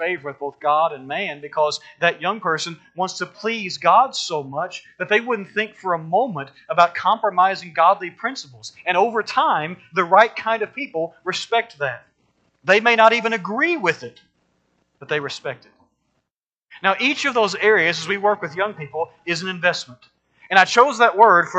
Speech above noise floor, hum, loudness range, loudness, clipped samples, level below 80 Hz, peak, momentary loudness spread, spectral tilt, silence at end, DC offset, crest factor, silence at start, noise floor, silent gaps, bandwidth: 63 dB; none; 4 LU; -19 LUFS; under 0.1%; -72 dBFS; 0 dBFS; 13 LU; -3.5 dB/octave; 0 s; under 0.1%; 20 dB; 0 s; -82 dBFS; 16.32-16.41 s, 16.58-16.62 s; 9 kHz